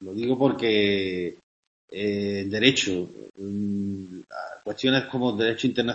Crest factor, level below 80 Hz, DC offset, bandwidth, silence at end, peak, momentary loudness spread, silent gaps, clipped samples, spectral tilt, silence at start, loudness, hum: 22 dB; -62 dBFS; under 0.1%; 8.4 kHz; 0 s; -4 dBFS; 16 LU; 1.43-1.88 s; under 0.1%; -4.5 dB/octave; 0 s; -25 LUFS; none